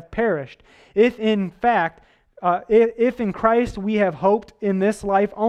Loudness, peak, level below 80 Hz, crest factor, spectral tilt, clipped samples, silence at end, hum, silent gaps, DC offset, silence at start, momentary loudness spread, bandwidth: -20 LUFS; -2 dBFS; -48 dBFS; 18 dB; -7 dB/octave; under 0.1%; 0 s; none; none; under 0.1%; 0.1 s; 7 LU; 11.5 kHz